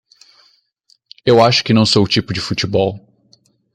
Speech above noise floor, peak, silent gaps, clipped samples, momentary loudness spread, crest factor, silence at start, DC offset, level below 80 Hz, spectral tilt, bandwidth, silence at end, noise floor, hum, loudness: 44 dB; -2 dBFS; none; under 0.1%; 10 LU; 16 dB; 1.25 s; under 0.1%; -50 dBFS; -5 dB/octave; 11 kHz; 0.75 s; -58 dBFS; none; -14 LUFS